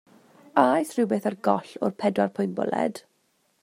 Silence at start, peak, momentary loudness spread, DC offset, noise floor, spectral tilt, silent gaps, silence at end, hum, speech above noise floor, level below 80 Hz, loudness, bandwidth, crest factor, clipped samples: 0.55 s; -4 dBFS; 7 LU; under 0.1%; -69 dBFS; -6.5 dB/octave; none; 0.65 s; none; 45 dB; -74 dBFS; -25 LUFS; 15.5 kHz; 22 dB; under 0.1%